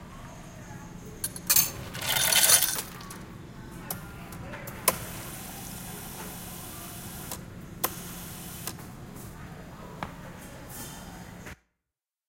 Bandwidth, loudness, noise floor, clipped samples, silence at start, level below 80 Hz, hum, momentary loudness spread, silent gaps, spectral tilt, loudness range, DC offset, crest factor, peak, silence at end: 17 kHz; -27 LUFS; -89 dBFS; under 0.1%; 0 s; -52 dBFS; none; 22 LU; none; -1 dB/octave; 17 LU; under 0.1%; 30 dB; -4 dBFS; 0.75 s